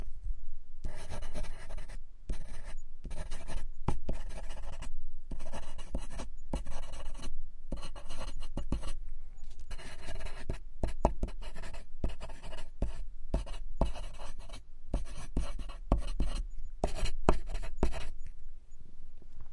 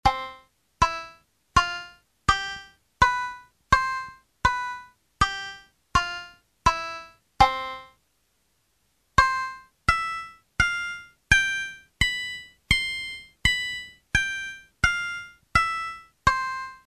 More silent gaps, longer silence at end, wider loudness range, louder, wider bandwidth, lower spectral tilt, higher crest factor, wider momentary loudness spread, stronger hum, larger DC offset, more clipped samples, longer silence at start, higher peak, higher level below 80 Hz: neither; about the same, 0 s vs 0.1 s; first, 7 LU vs 3 LU; second, -42 LUFS vs -25 LUFS; second, 11 kHz vs 14.5 kHz; first, -6 dB/octave vs -2.5 dB/octave; about the same, 24 dB vs 24 dB; about the same, 14 LU vs 15 LU; neither; neither; neither; about the same, 0 s vs 0.05 s; about the same, -6 dBFS vs -4 dBFS; about the same, -36 dBFS vs -40 dBFS